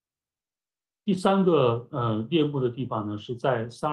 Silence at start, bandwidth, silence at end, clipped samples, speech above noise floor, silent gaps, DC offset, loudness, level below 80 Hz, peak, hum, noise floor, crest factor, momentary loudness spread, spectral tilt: 1.05 s; 11.5 kHz; 0 s; under 0.1%; over 65 dB; none; under 0.1%; -26 LUFS; -64 dBFS; -8 dBFS; none; under -90 dBFS; 18 dB; 10 LU; -7.5 dB/octave